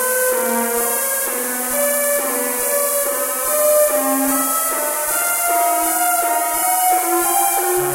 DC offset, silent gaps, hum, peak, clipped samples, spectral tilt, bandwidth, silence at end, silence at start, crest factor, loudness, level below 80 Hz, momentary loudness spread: under 0.1%; none; none; -2 dBFS; under 0.1%; -1 dB/octave; 16 kHz; 0 s; 0 s; 16 dB; -16 LUFS; -56 dBFS; 3 LU